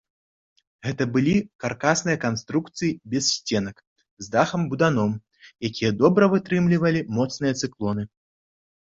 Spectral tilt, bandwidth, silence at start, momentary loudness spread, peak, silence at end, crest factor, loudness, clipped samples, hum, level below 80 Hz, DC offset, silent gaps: -5 dB/octave; 7.8 kHz; 0.85 s; 11 LU; -4 dBFS; 0.8 s; 20 dB; -23 LUFS; under 0.1%; none; -56 dBFS; under 0.1%; 1.55-1.59 s, 3.87-3.96 s, 4.11-4.17 s